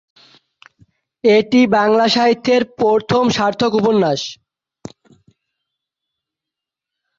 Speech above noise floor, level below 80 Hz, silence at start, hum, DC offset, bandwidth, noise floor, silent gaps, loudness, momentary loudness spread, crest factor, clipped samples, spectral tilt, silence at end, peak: 71 dB; -56 dBFS; 1.25 s; none; under 0.1%; 7.6 kHz; -85 dBFS; none; -15 LUFS; 6 LU; 16 dB; under 0.1%; -5 dB/octave; 2.85 s; -2 dBFS